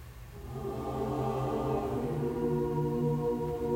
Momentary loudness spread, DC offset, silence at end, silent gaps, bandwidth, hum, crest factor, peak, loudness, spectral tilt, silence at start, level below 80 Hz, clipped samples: 9 LU; under 0.1%; 0 s; none; 16 kHz; none; 12 dB; -20 dBFS; -33 LUFS; -8.5 dB/octave; 0 s; -48 dBFS; under 0.1%